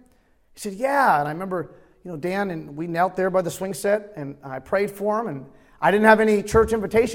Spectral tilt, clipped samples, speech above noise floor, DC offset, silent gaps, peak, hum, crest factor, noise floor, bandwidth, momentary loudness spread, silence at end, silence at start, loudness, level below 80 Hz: -5.5 dB/octave; under 0.1%; 37 dB; under 0.1%; none; -2 dBFS; none; 22 dB; -58 dBFS; 16.5 kHz; 18 LU; 0 s; 0.55 s; -22 LUFS; -48 dBFS